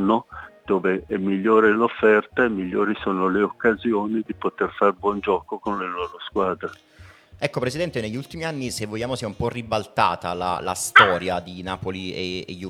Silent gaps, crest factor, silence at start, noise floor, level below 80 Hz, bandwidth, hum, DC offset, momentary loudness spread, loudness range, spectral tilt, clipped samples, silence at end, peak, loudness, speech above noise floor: none; 22 dB; 0 s; -47 dBFS; -54 dBFS; 15 kHz; none; under 0.1%; 12 LU; 7 LU; -4.5 dB/octave; under 0.1%; 0 s; 0 dBFS; -22 LUFS; 25 dB